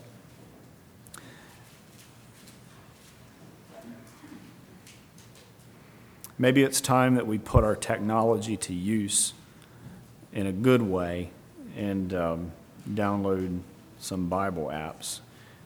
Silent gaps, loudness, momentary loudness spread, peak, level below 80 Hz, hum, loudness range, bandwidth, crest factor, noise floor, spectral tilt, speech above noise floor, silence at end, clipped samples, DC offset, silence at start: none; -27 LUFS; 25 LU; -4 dBFS; -46 dBFS; none; 7 LU; over 20 kHz; 26 dB; -52 dBFS; -5 dB/octave; 26 dB; 0.4 s; under 0.1%; under 0.1%; 0 s